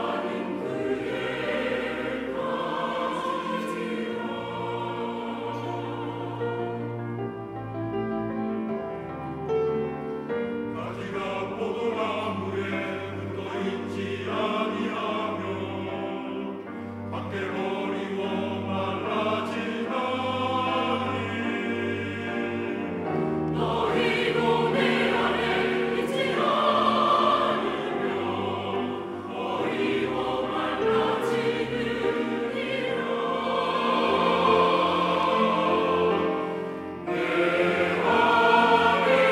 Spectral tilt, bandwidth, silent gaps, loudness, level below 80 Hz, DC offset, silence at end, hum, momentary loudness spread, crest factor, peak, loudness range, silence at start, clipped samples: -6 dB/octave; 14 kHz; none; -26 LUFS; -60 dBFS; under 0.1%; 0 s; none; 11 LU; 18 dB; -8 dBFS; 8 LU; 0 s; under 0.1%